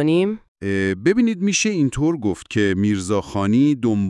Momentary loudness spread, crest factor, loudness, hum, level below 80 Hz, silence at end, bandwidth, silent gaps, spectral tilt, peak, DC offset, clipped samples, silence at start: 6 LU; 14 dB; -20 LUFS; none; -48 dBFS; 0 s; 11.5 kHz; 0.48-0.55 s; -5.5 dB/octave; -4 dBFS; under 0.1%; under 0.1%; 0 s